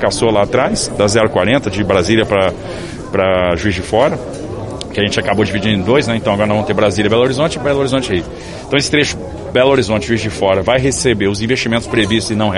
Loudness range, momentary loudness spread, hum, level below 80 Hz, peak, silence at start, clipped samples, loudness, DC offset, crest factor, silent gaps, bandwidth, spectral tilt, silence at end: 2 LU; 8 LU; none; -34 dBFS; 0 dBFS; 0 s; under 0.1%; -14 LUFS; under 0.1%; 14 dB; none; 11.5 kHz; -5 dB/octave; 0 s